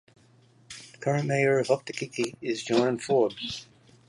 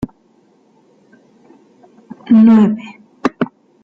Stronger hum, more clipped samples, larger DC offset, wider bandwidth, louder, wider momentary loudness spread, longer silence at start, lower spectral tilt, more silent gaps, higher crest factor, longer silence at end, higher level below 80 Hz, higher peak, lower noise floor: neither; neither; neither; first, 11.5 kHz vs 5.8 kHz; second, -27 LUFS vs -13 LUFS; second, 15 LU vs 24 LU; first, 0.7 s vs 0 s; second, -5.5 dB/octave vs -8.5 dB/octave; neither; first, 20 dB vs 14 dB; about the same, 0.45 s vs 0.4 s; second, -68 dBFS vs -52 dBFS; second, -8 dBFS vs -2 dBFS; first, -59 dBFS vs -53 dBFS